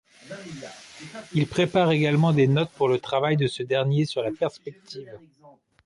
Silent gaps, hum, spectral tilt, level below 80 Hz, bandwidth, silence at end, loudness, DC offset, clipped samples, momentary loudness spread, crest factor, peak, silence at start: none; none; -7 dB/octave; -62 dBFS; 11.5 kHz; 0.7 s; -23 LUFS; under 0.1%; under 0.1%; 20 LU; 16 dB; -8 dBFS; 0.25 s